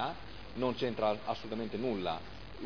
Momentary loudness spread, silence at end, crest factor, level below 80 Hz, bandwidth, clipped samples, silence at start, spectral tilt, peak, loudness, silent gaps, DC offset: 12 LU; 0 s; 18 dB; -56 dBFS; 5.4 kHz; under 0.1%; 0 s; -4 dB/octave; -18 dBFS; -36 LUFS; none; 0.4%